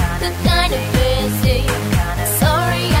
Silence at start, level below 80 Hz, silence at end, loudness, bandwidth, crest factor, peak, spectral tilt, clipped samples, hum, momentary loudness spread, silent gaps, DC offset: 0 s; -22 dBFS; 0 s; -17 LUFS; 16.5 kHz; 14 dB; -2 dBFS; -4.5 dB/octave; under 0.1%; none; 3 LU; none; under 0.1%